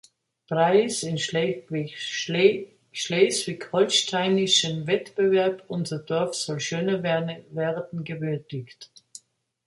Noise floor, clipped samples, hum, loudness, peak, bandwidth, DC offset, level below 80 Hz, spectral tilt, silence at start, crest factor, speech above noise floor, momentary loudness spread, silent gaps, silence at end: -57 dBFS; under 0.1%; none; -24 LUFS; -6 dBFS; 11.5 kHz; under 0.1%; -70 dBFS; -4 dB/octave; 0.5 s; 20 dB; 33 dB; 12 LU; none; 0.8 s